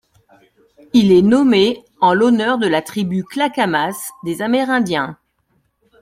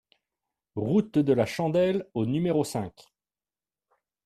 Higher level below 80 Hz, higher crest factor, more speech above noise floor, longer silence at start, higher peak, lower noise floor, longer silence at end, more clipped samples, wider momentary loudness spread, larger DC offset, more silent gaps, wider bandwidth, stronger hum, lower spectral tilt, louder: first, -54 dBFS vs -62 dBFS; about the same, 14 dB vs 18 dB; second, 49 dB vs over 64 dB; first, 0.95 s vs 0.75 s; first, -2 dBFS vs -10 dBFS; second, -64 dBFS vs under -90 dBFS; second, 0.85 s vs 1.35 s; neither; about the same, 11 LU vs 10 LU; neither; neither; first, 16 kHz vs 14 kHz; neither; second, -5.5 dB/octave vs -7 dB/octave; first, -16 LUFS vs -26 LUFS